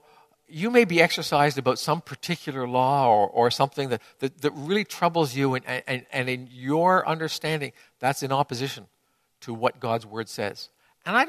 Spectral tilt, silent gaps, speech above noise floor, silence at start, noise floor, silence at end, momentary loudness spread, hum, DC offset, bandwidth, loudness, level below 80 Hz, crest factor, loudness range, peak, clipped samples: -5 dB/octave; none; 37 dB; 0.5 s; -61 dBFS; 0 s; 12 LU; none; under 0.1%; 14 kHz; -25 LUFS; -68 dBFS; 22 dB; 6 LU; -4 dBFS; under 0.1%